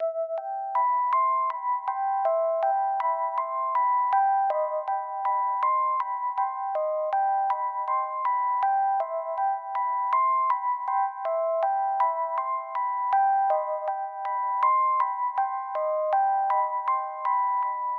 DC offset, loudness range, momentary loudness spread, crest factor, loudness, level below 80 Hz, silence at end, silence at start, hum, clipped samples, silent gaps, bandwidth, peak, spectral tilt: under 0.1%; 1 LU; 6 LU; 14 dB; -26 LUFS; under -90 dBFS; 0 s; 0 s; none; under 0.1%; none; 4.6 kHz; -12 dBFS; 0 dB/octave